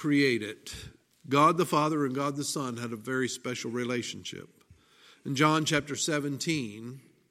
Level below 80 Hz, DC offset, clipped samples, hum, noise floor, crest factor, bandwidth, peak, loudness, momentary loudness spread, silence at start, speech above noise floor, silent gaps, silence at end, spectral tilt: -64 dBFS; under 0.1%; under 0.1%; none; -59 dBFS; 22 dB; 16 kHz; -8 dBFS; -29 LUFS; 18 LU; 0 s; 30 dB; none; 0.3 s; -4.5 dB/octave